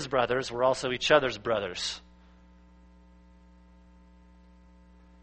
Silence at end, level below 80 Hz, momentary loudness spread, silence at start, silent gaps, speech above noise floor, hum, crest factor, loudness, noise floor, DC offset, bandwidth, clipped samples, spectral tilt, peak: 3.25 s; -56 dBFS; 10 LU; 0 s; none; 28 dB; none; 26 dB; -27 LUFS; -56 dBFS; under 0.1%; 8.4 kHz; under 0.1%; -3.5 dB/octave; -6 dBFS